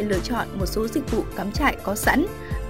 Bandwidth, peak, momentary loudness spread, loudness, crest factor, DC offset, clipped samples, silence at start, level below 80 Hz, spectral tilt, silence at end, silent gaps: 16 kHz; -6 dBFS; 6 LU; -24 LUFS; 18 dB; 0.7%; under 0.1%; 0 s; -34 dBFS; -5 dB/octave; 0 s; none